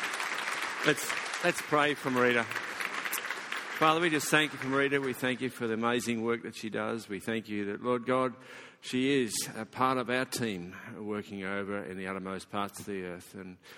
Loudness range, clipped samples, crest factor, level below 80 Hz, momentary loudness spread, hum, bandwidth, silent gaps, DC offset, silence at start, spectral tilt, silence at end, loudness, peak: 5 LU; under 0.1%; 24 dB; -72 dBFS; 11 LU; none; 17 kHz; none; under 0.1%; 0 s; -3.5 dB/octave; 0 s; -31 LUFS; -8 dBFS